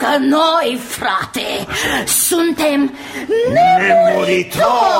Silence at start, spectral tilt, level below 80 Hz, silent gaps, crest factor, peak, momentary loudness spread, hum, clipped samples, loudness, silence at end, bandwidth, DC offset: 0 s; -3 dB/octave; -48 dBFS; none; 12 dB; -2 dBFS; 9 LU; none; under 0.1%; -14 LUFS; 0 s; 16.5 kHz; under 0.1%